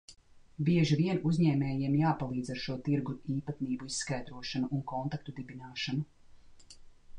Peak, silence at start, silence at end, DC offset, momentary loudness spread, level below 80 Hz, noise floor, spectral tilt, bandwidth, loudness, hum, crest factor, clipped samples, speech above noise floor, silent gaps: -16 dBFS; 0.1 s; 0 s; under 0.1%; 10 LU; -60 dBFS; -54 dBFS; -6 dB/octave; 10 kHz; -33 LUFS; none; 16 dB; under 0.1%; 22 dB; none